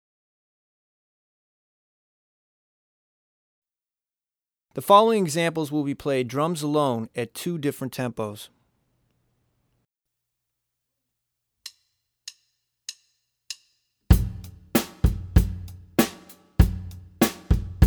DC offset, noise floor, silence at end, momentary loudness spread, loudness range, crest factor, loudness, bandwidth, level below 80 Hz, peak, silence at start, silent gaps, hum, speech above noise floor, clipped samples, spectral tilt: under 0.1%; under -90 dBFS; 0 s; 20 LU; 20 LU; 26 dB; -24 LUFS; over 20 kHz; -34 dBFS; -2 dBFS; 4.75 s; none; none; over 67 dB; under 0.1%; -6 dB/octave